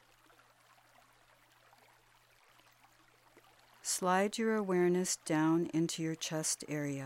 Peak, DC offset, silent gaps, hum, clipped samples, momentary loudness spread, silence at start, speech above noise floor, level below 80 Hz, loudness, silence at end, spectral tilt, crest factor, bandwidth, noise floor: -18 dBFS; under 0.1%; none; none; under 0.1%; 6 LU; 3.85 s; 33 dB; -78 dBFS; -33 LUFS; 0 s; -4 dB/octave; 20 dB; 16.5 kHz; -67 dBFS